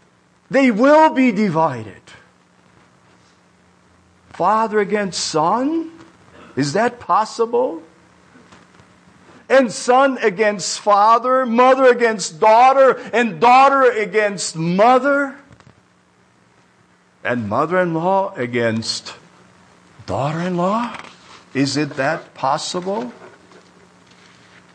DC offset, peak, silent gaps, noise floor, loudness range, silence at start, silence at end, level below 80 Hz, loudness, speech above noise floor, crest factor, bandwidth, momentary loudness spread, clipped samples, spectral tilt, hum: under 0.1%; -4 dBFS; none; -55 dBFS; 10 LU; 0.5 s; 1.45 s; -64 dBFS; -16 LUFS; 39 dB; 14 dB; 9.8 kHz; 13 LU; under 0.1%; -4.5 dB/octave; none